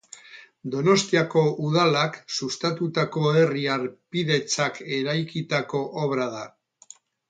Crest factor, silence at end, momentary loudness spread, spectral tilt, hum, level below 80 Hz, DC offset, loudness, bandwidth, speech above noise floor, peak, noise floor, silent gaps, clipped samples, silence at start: 18 dB; 0.8 s; 10 LU; -5 dB/octave; none; -68 dBFS; under 0.1%; -24 LUFS; 9.4 kHz; 28 dB; -6 dBFS; -52 dBFS; none; under 0.1%; 0.15 s